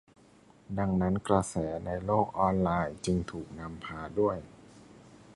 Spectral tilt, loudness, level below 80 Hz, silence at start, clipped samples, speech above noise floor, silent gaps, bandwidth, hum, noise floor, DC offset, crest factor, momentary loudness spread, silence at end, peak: -7 dB/octave; -31 LUFS; -50 dBFS; 0.7 s; under 0.1%; 29 dB; none; 11.5 kHz; none; -59 dBFS; under 0.1%; 22 dB; 13 LU; 0 s; -10 dBFS